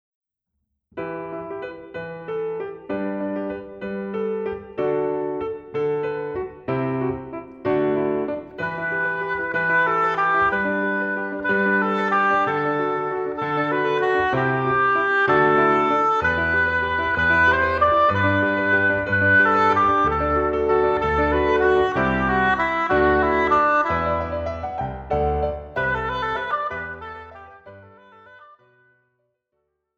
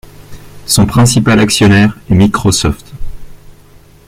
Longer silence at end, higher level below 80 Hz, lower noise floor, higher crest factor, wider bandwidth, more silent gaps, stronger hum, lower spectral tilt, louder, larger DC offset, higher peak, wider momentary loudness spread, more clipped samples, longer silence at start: first, 1.55 s vs 0.7 s; second, -42 dBFS vs -28 dBFS; first, -78 dBFS vs -40 dBFS; about the same, 16 dB vs 12 dB; second, 7.6 kHz vs 16 kHz; neither; neither; first, -7 dB/octave vs -5 dB/octave; second, -21 LUFS vs -9 LUFS; neither; second, -6 dBFS vs 0 dBFS; second, 13 LU vs 18 LU; neither; first, 0.95 s vs 0.3 s